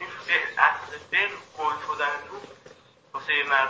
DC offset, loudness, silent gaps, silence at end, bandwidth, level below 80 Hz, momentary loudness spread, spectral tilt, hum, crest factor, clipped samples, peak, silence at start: under 0.1%; -25 LUFS; none; 0 s; 8 kHz; -68 dBFS; 14 LU; -2 dB/octave; none; 24 dB; under 0.1%; -4 dBFS; 0 s